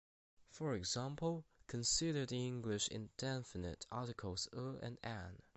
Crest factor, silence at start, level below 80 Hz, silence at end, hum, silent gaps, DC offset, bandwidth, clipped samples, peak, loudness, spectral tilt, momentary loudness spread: 18 dB; 0.4 s; -62 dBFS; 0.15 s; none; none; under 0.1%; 8.4 kHz; under 0.1%; -26 dBFS; -43 LUFS; -4 dB/octave; 11 LU